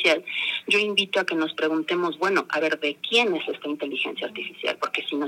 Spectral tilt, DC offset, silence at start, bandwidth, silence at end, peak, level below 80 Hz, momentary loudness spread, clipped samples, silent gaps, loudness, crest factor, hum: -3 dB/octave; under 0.1%; 0 s; 16 kHz; 0 s; -6 dBFS; -84 dBFS; 8 LU; under 0.1%; none; -24 LUFS; 20 dB; none